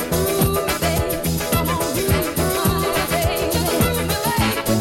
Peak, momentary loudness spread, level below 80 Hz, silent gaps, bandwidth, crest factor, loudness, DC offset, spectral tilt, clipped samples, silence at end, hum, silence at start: -4 dBFS; 2 LU; -32 dBFS; none; 16.5 kHz; 14 dB; -19 LUFS; under 0.1%; -4.5 dB/octave; under 0.1%; 0 s; none; 0 s